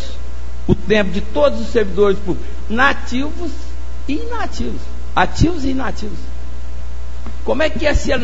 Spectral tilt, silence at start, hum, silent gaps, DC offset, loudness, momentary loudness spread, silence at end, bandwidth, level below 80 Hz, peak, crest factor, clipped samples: -6 dB/octave; 0 s; none; none; 20%; -19 LUFS; 16 LU; 0 s; 8 kHz; -26 dBFS; 0 dBFS; 20 dB; under 0.1%